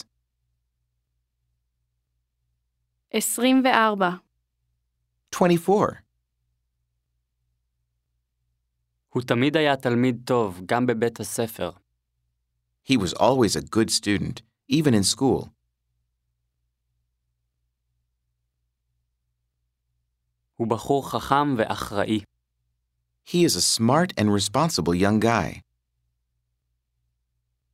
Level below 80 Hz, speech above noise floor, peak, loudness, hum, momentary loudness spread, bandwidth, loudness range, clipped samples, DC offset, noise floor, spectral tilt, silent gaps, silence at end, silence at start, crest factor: -56 dBFS; 55 dB; -2 dBFS; -22 LUFS; none; 10 LU; 16 kHz; 7 LU; under 0.1%; under 0.1%; -77 dBFS; -4.5 dB/octave; none; 2.15 s; 3.15 s; 24 dB